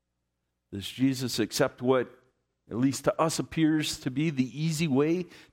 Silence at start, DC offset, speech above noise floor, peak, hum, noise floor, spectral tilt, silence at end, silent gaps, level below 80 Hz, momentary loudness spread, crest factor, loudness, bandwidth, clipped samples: 0.7 s; under 0.1%; 53 dB; -10 dBFS; none; -81 dBFS; -5 dB/octave; 0.1 s; none; -62 dBFS; 10 LU; 18 dB; -28 LUFS; 16 kHz; under 0.1%